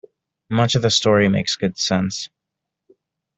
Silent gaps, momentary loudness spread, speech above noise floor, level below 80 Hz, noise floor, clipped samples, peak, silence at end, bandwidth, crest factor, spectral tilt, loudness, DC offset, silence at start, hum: none; 10 LU; 64 dB; -54 dBFS; -82 dBFS; under 0.1%; -4 dBFS; 1.1 s; 8.4 kHz; 18 dB; -4.5 dB/octave; -18 LUFS; under 0.1%; 0.5 s; none